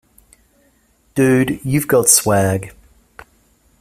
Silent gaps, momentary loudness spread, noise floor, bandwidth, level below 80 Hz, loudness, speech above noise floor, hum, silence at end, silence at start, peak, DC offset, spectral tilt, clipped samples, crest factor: none; 14 LU; -57 dBFS; 16 kHz; -48 dBFS; -15 LUFS; 43 dB; none; 1.1 s; 1.15 s; 0 dBFS; under 0.1%; -4 dB/octave; under 0.1%; 18 dB